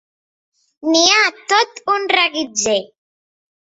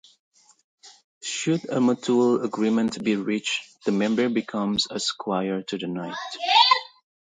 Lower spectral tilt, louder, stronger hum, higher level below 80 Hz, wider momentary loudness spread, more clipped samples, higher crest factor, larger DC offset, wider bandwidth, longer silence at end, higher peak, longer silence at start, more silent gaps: second, -0.5 dB/octave vs -4 dB/octave; first, -15 LUFS vs -23 LUFS; neither; first, -62 dBFS vs -68 dBFS; second, 8 LU vs 11 LU; neither; about the same, 18 dB vs 22 dB; neither; second, 8 kHz vs 9.6 kHz; first, 0.9 s vs 0.5 s; first, 0 dBFS vs -4 dBFS; about the same, 0.85 s vs 0.85 s; second, none vs 1.04-1.21 s